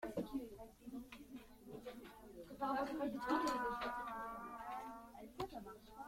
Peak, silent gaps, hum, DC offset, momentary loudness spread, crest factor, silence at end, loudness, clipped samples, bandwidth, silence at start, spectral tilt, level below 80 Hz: -26 dBFS; none; none; under 0.1%; 17 LU; 20 dB; 0 s; -45 LUFS; under 0.1%; 16.5 kHz; 0 s; -5 dB/octave; -68 dBFS